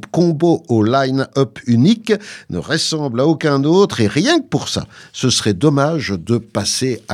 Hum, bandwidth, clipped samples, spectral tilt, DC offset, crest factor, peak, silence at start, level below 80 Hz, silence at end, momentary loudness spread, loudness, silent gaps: none; 15 kHz; under 0.1%; -5 dB/octave; under 0.1%; 16 dB; 0 dBFS; 0.15 s; -52 dBFS; 0 s; 7 LU; -16 LUFS; none